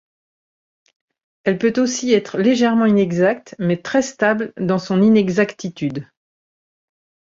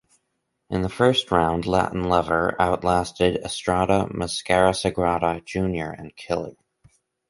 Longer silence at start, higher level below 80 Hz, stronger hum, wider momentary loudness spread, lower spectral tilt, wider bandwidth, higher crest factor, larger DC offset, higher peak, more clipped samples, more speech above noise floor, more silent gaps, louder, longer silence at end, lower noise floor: first, 1.45 s vs 0.7 s; second, -60 dBFS vs -42 dBFS; neither; about the same, 10 LU vs 9 LU; about the same, -5.5 dB/octave vs -5 dB/octave; second, 7.8 kHz vs 11.5 kHz; about the same, 16 dB vs 20 dB; neither; about the same, -2 dBFS vs -2 dBFS; neither; first, over 73 dB vs 53 dB; neither; first, -18 LUFS vs -22 LUFS; first, 1.2 s vs 0.75 s; first, under -90 dBFS vs -76 dBFS